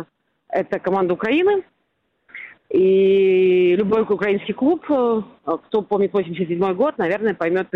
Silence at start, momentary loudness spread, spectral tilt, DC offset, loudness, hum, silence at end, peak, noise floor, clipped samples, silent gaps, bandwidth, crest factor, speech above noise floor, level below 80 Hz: 0 s; 10 LU; -8.5 dB/octave; under 0.1%; -19 LUFS; none; 0.1 s; -8 dBFS; -70 dBFS; under 0.1%; none; 4.5 kHz; 12 dB; 51 dB; -60 dBFS